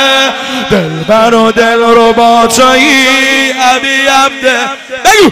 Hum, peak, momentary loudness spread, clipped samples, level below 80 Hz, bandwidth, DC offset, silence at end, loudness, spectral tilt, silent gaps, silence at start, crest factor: none; 0 dBFS; 6 LU; 2%; -38 dBFS; 16.5 kHz; under 0.1%; 0 s; -6 LUFS; -2.5 dB/octave; none; 0 s; 6 dB